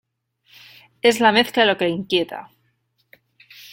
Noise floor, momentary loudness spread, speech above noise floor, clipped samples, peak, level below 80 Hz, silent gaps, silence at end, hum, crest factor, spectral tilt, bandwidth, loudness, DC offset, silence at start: -67 dBFS; 10 LU; 49 dB; under 0.1%; -2 dBFS; -64 dBFS; none; 1.3 s; none; 20 dB; -4 dB/octave; 16.5 kHz; -18 LUFS; under 0.1%; 1.05 s